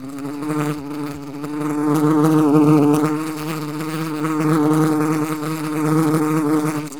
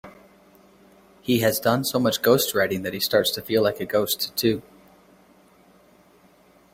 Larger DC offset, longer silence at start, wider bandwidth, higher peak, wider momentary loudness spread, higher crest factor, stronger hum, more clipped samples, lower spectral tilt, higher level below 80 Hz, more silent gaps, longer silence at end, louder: first, 0.7% vs under 0.1%; about the same, 0 s vs 0.05 s; first, 19.5 kHz vs 16.5 kHz; about the same, -2 dBFS vs -4 dBFS; first, 13 LU vs 5 LU; about the same, 18 dB vs 20 dB; neither; neither; first, -7 dB/octave vs -4 dB/octave; about the same, -60 dBFS vs -60 dBFS; neither; second, 0 s vs 2.15 s; first, -19 LUFS vs -22 LUFS